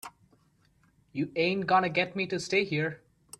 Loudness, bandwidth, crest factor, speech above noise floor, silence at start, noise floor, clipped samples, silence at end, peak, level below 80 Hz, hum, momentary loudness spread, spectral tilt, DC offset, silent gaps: -28 LUFS; 15.5 kHz; 20 dB; 38 dB; 0.05 s; -66 dBFS; under 0.1%; 0.45 s; -12 dBFS; -68 dBFS; none; 15 LU; -5 dB/octave; under 0.1%; none